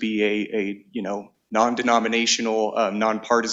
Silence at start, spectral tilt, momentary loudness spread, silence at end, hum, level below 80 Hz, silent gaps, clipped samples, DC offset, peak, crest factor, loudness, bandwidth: 0 s; -3 dB/octave; 10 LU; 0 s; none; -66 dBFS; none; under 0.1%; under 0.1%; -4 dBFS; 18 dB; -22 LUFS; 8 kHz